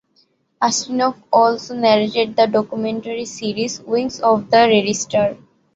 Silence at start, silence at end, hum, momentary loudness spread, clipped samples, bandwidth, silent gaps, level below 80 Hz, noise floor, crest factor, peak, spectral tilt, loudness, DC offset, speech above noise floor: 0.6 s; 0.4 s; none; 9 LU; under 0.1%; 8 kHz; none; -60 dBFS; -61 dBFS; 16 dB; -2 dBFS; -3.5 dB/octave; -17 LUFS; under 0.1%; 43 dB